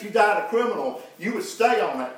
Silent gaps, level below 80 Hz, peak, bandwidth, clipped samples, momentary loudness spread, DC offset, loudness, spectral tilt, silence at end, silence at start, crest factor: none; -88 dBFS; -6 dBFS; 16 kHz; under 0.1%; 10 LU; under 0.1%; -23 LUFS; -3.5 dB/octave; 0 s; 0 s; 18 dB